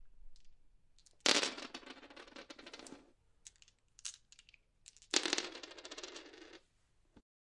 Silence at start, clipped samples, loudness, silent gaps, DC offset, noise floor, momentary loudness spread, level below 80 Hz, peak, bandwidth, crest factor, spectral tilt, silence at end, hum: 0 s; under 0.1%; -37 LUFS; none; under 0.1%; -73 dBFS; 27 LU; -68 dBFS; -8 dBFS; 11.5 kHz; 38 dB; 0 dB/octave; 0.3 s; none